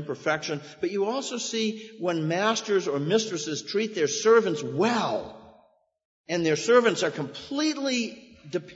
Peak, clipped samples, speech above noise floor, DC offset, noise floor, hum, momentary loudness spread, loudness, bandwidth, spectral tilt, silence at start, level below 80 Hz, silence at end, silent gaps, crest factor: -8 dBFS; under 0.1%; 36 dB; under 0.1%; -62 dBFS; none; 12 LU; -26 LUFS; 8 kHz; -4 dB/octave; 0 s; -70 dBFS; 0 s; 6.05-6.24 s; 18 dB